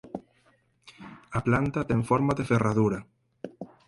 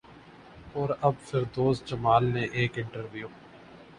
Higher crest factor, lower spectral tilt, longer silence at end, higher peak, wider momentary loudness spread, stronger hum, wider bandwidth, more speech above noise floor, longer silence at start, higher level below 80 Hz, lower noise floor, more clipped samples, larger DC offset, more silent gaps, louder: about the same, 18 dB vs 20 dB; about the same, -8 dB/octave vs -7 dB/octave; first, 0.2 s vs 0.05 s; about the same, -10 dBFS vs -8 dBFS; first, 20 LU vs 15 LU; neither; about the same, 11.5 kHz vs 10.5 kHz; first, 40 dB vs 23 dB; about the same, 0.05 s vs 0.1 s; about the same, -52 dBFS vs -56 dBFS; first, -66 dBFS vs -51 dBFS; neither; neither; neither; about the same, -26 LUFS vs -28 LUFS